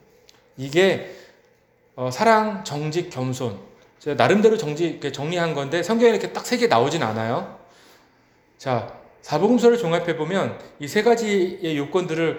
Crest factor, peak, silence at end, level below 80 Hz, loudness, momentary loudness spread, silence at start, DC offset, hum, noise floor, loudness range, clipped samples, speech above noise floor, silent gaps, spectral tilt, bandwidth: 22 dB; 0 dBFS; 0 s; -62 dBFS; -21 LUFS; 13 LU; 0.6 s; under 0.1%; none; -59 dBFS; 3 LU; under 0.1%; 39 dB; none; -5.5 dB/octave; over 20 kHz